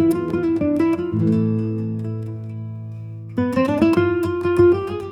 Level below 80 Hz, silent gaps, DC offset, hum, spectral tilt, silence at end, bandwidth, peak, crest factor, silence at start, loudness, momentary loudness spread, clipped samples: -52 dBFS; none; under 0.1%; none; -8.5 dB/octave; 0 s; 13 kHz; -4 dBFS; 16 dB; 0 s; -20 LUFS; 15 LU; under 0.1%